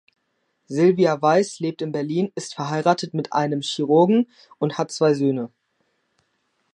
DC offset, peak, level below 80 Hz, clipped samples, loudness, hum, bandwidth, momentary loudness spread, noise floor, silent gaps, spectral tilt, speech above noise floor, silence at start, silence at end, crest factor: under 0.1%; -2 dBFS; -74 dBFS; under 0.1%; -21 LUFS; none; 11 kHz; 10 LU; -72 dBFS; none; -6 dB/octave; 51 dB; 0.7 s; 1.25 s; 20 dB